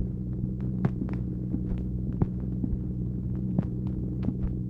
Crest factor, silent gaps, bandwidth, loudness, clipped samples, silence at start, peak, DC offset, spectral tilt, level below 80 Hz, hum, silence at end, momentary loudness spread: 18 dB; none; 3.3 kHz; -31 LUFS; under 0.1%; 0 s; -12 dBFS; under 0.1%; -12 dB/octave; -36 dBFS; none; 0 s; 3 LU